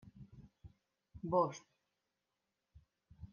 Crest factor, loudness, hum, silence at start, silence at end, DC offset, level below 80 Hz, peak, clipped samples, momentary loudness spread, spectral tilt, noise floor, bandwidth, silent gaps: 24 dB; -37 LUFS; none; 0.05 s; 0.05 s; under 0.1%; -68 dBFS; -20 dBFS; under 0.1%; 25 LU; -7.5 dB/octave; -88 dBFS; 7 kHz; none